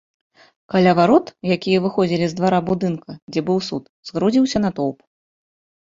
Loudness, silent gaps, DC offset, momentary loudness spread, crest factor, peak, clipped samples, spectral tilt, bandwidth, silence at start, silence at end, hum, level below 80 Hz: -19 LUFS; 3.22-3.27 s, 3.89-4.03 s; under 0.1%; 11 LU; 18 dB; -2 dBFS; under 0.1%; -6.5 dB/octave; 7.8 kHz; 0.7 s; 0.9 s; none; -54 dBFS